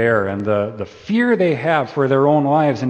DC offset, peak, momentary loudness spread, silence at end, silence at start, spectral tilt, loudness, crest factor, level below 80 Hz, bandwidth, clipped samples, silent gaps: under 0.1%; -2 dBFS; 7 LU; 0 s; 0 s; -8 dB/octave; -17 LUFS; 14 dB; -58 dBFS; 8.6 kHz; under 0.1%; none